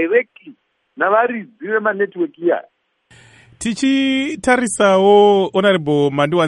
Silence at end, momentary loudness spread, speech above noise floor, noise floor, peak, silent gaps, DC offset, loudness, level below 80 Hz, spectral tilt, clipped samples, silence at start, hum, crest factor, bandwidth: 0 s; 11 LU; 36 dB; -51 dBFS; 0 dBFS; none; under 0.1%; -16 LUFS; -54 dBFS; -5 dB/octave; under 0.1%; 0 s; none; 16 dB; 11.5 kHz